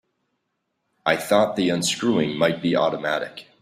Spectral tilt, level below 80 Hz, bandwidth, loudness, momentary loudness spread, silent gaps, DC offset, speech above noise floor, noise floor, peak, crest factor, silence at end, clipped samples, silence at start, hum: -4 dB/octave; -62 dBFS; 15.5 kHz; -22 LUFS; 7 LU; none; under 0.1%; 54 dB; -76 dBFS; -4 dBFS; 20 dB; 0.2 s; under 0.1%; 1.05 s; none